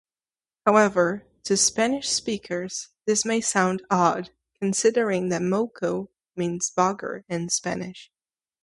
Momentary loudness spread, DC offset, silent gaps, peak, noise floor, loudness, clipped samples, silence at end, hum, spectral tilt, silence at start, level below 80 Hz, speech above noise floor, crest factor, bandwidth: 12 LU; under 0.1%; none; -4 dBFS; under -90 dBFS; -24 LUFS; under 0.1%; 0.6 s; none; -3.5 dB/octave; 0.65 s; -64 dBFS; over 66 dB; 22 dB; 11.5 kHz